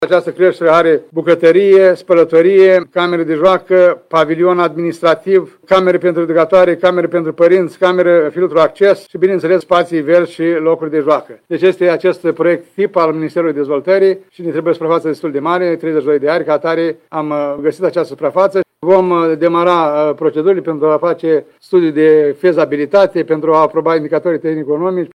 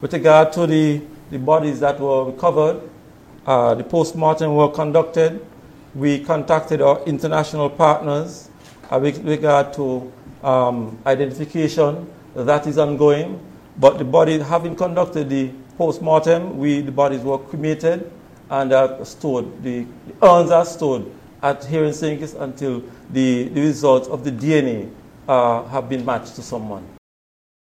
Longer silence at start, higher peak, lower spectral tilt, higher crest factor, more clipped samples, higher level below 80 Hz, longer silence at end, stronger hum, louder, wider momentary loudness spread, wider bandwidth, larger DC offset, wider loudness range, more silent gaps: about the same, 0 s vs 0 s; about the same, 0 dBFS vs 0 dBFS; about the same, -7 dB/octave vs -6.5 dB/octave; second, 12 dB vs 18 dB; neither; about the same, -58 dBFS vs -54 dBFS; second, 0.05 s vs 0.9 s; neither; first, -12 LUFS vs -18 LUFS; second, 7 LU vs 13 LU; second, 9.8 kHz vs 15 kHz; neither; about the same, 5 LU vs 3 LU; neither